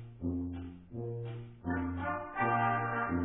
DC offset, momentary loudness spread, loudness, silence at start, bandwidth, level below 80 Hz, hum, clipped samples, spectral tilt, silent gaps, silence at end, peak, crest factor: under 0.1%; 13 LU; -36 LUFS; 0 s; 3.8 kHz; -56 dBFS; none; under 0.1%; -3 dB/octave; none; 0 s; -18 dBFS; 16 dB